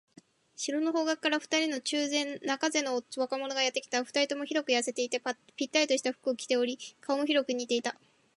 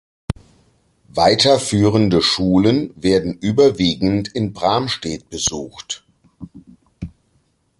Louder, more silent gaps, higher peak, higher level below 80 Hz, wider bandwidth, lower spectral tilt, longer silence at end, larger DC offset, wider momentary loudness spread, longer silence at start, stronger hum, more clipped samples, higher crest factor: second, -30 LUFS vs -17 LUFS; neither; second, -12 dBFS vs 0 dBFS; second, -84 dBFS vs -42 dBFS; about the same, 11.5 kHz vs 11.5 kHz; second, -1 dB/octave vs -5 dB/octave; second, 0.45 s vs 0.7 s; neither; second, 6 LU vs 16 LU; first, 0.6 s vs 0.3 s; neither; neither; about the same, 20 dB vs 18 dB